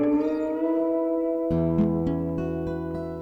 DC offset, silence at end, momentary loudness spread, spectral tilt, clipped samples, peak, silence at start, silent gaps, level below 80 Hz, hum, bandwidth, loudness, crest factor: under 0.1%; 0 s; 7 LU; -10.5 dB/octave; under 0.1%; -12 dBFS; 0 s; none; -44 dBFS; none; 5 kHz; -26 LUFS; 14 dB